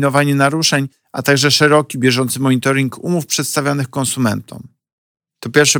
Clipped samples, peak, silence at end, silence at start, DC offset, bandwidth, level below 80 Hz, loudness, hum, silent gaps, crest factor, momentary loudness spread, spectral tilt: under 0.1%; -2 dBFS; 0 s; 0 s; under 0.1%; over 20 kHz; -60 dBFS; -15 LUFS; none; 4.92-5.15 s; 14 dB; 8 LU; -4 dB/octave